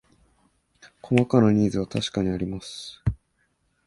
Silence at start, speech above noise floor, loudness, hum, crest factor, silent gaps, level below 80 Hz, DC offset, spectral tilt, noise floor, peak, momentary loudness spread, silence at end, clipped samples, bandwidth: 1.05 s; 47 dB; -24 LUFS; none; 20 dB; none; -44 dBFS; under 0.1%; -7 dB/octave; -70 dBFS; -6 dBFS; 15 LU; 0.7 s; under 0.1%; 11.5 kHz